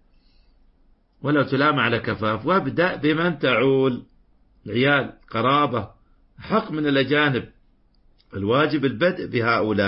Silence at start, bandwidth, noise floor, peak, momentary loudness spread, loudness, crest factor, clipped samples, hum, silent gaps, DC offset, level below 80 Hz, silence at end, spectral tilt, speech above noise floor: 1.2 s; 5.8 kHz; -58 dBFS; -6 dBFS; 10 LU; -21 LUFS; 18 dB; under 0.1%; none; none; under 0.1%; -54 dBFS; 0 s; -11 dB/octave; 38 dB